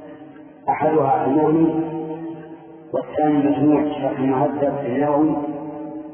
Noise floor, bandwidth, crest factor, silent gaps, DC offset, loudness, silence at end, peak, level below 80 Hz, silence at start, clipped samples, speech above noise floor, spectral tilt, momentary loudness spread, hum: -41 dBFS; 3.4 kHz; 14 dB; none; under 0.1%; -20 LUFS; 0 s; -6 dBFS; -58 dBFS; 0 s; under 0.1%; 23 dB; -12 dB/octave; 15 LU; none